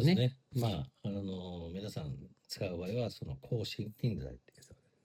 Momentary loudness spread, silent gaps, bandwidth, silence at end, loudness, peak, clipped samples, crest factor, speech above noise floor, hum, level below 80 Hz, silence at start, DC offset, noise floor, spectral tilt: 11 LU; none; 16 kHz; 0.3 s; -38 LUFS; -18 dBFS; under 0.1%; 20 dB; 25 dB; none; -60 dBFS; 0 s; under 0.1%; -62 dBFS; -7 dB/octave